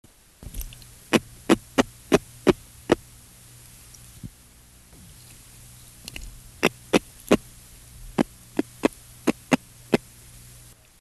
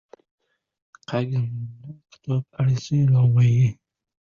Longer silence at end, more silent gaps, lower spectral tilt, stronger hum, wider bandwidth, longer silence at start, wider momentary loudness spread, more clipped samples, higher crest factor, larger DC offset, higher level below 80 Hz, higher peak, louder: first, 1.05 s vs 0.6 s; neither; second, -4.5 dB/octave vs -8 dB/octave; neither; first, 13 kHz vs 7 kHz; second, 0.4 s vs 1.1 s; first, 23 LU vs 17 LU; neither; first, 26 dB vs 12 dB; neither; first, -48 dBFS vs -56 dBFS; first, -2 dBFS vs -10 dBFS; second, -25 LUFS vs -22 LUFS